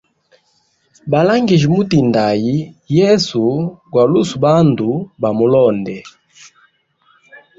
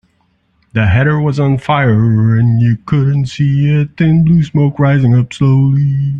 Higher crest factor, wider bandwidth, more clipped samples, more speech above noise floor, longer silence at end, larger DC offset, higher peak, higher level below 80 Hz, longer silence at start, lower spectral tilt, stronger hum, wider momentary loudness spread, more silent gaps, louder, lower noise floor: about the same, 14 dB vs 10 dB; about the same, 7.8 kHz vs 7.6 kHz; neither; about the same, 47 dB vs 47 dB; first, 0.2 s vs 0 s; neither; about the same, -2 dBFS vs -2 dBFS; second, -50 dBFS vs -40 dBFS; first, 1.05 s vs 0.75 s; second, -7 dB/octave vs -8.5 dB/octave; neither; first, 9 LU vs 4 LU; neither; about the same, -14 LUFS vs -12 LUFS; about the same, -60 dBFS vs -58 dBFS